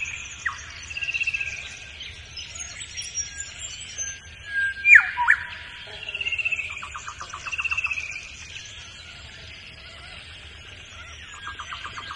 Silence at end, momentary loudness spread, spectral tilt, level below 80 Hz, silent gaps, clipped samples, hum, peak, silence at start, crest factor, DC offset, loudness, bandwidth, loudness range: 0 s; 19 LU; 0 dB/octave; -52 dBFS; none; under 0.1%; none; -2 dBFS; 0 s; 26 dB; under 0.1%; -23 LUFS; 11.5 kHz; 18 LU